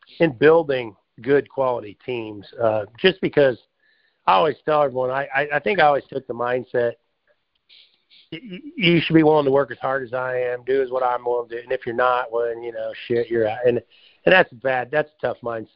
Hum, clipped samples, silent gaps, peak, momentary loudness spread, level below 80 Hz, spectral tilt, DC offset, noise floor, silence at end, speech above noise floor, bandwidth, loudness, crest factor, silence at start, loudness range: none; under 0.1%; none; 0 dBFS; 14 LU; -58 dBFS; -3.5 dB/octave; under 0.1%; -67 dBFS; 0.1 s; 47 dB; 5.6 kHz; -21 LUFS; 20 dB; 0.2 s; 3 LU